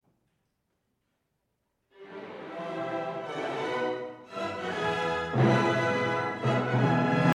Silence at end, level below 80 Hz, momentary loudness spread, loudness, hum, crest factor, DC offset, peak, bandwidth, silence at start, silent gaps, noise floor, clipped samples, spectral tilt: 0 s; -64 dBFS; 15 LU; -29 LUFS; none; 18 dB; under 0.1%; -12 dBFS; 10.5 kHz; 2 s; none; -78 dBFS; under 0.1%; -7 dB/octave